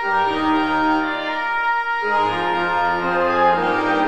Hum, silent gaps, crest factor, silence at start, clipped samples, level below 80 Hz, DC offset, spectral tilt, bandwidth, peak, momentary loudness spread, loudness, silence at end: none; none; 14 dB; 0 s; under 0.1%; -52 dBFS; 0.9%; -5.5 dB/octave; 9 kHz; -4 dBFS; 4 LU; -19 LUFS; 0 s